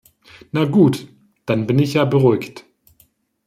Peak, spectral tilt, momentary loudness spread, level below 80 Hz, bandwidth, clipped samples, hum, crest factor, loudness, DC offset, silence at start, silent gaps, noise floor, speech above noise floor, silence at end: -2 dBFS; -7.5 dB/octave; 14 LU; -58 dBFS; 15 kHz; under 0.1%; none; 16 dB; -17 LUFS; under 0.1%; 0.55 s; none; -58 dBFS; 42 dB; 0.85 s